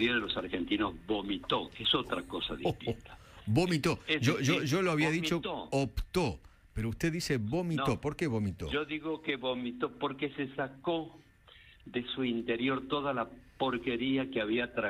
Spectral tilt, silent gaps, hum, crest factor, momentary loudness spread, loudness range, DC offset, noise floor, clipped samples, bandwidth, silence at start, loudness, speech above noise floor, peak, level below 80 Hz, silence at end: -5.5 dB/octave; none; none; 18 dB; 8 LU; 5 LU; under 0.1%; -58 dBFS; under 0.1%; 15.5 kHz; 0 s; -33 LUFS; 26 dB; -16 dBFS; -52 dBFS; 0 s